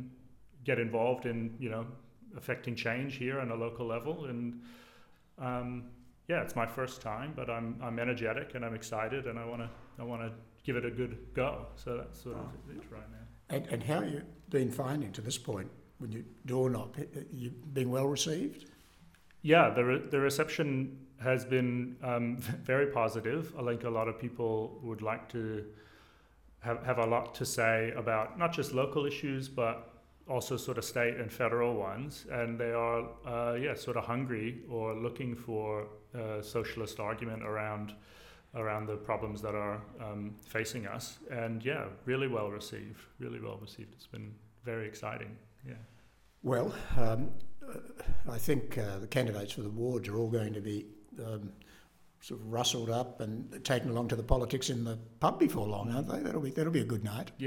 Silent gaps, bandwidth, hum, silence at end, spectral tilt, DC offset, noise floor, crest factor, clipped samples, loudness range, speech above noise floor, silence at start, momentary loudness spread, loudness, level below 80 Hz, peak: none; 17.5 kHz; none; 0 s; -5.5 dB/octave; under 0.1%; -64 dBFS; 24 dB; under 0.1%; 7 LU; 29 dB; 0 s; 15 LU; -35 LUFS; -52 dBFS; -10 dBFS